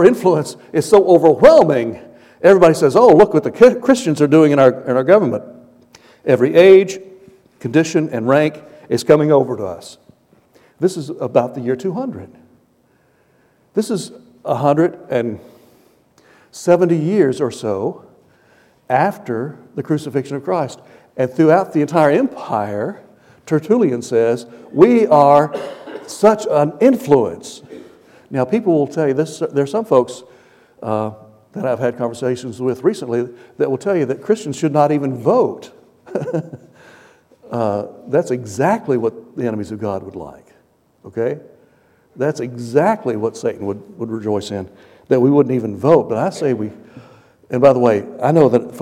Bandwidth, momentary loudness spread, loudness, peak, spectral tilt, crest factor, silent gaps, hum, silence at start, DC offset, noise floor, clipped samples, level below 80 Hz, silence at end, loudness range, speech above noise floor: 15 kHz; 16 LU; -15 LUFS; 0 dBFS; -7 dB/octave; 16 dB; none; none; 0 s; under 0.1%; -57 dBFS; under 0.1%; -56 dBFS; 0 s; 10 LU; 42 dB